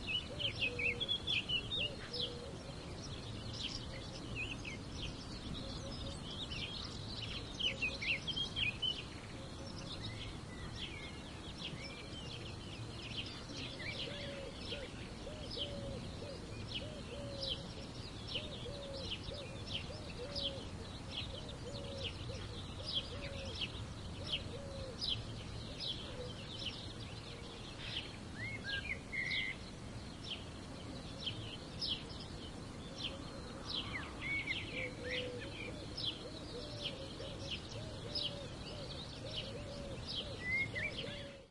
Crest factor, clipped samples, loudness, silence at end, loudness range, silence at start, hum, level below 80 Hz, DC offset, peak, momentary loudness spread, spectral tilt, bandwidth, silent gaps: 18 dB; under 0.1%; -42 LUFS; 0 s; 6 LU; 0 s; none; -56 dBFS; under 0.1%; -26 dBFS; 11 LU; -4 dB/octave; 11.5 kHz; none